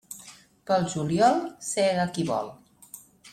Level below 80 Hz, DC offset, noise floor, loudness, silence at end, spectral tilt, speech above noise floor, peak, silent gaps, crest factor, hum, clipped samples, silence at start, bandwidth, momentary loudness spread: -62 dBFS; under 0.1%; -50 dBFS; -25 LUFS; 0.05 s; -5 dB/octave; 26 dB; -8 dBFS; none; 18 dB; none; under 0.1%; 0.1 s; 15.5 kHz; 23 LU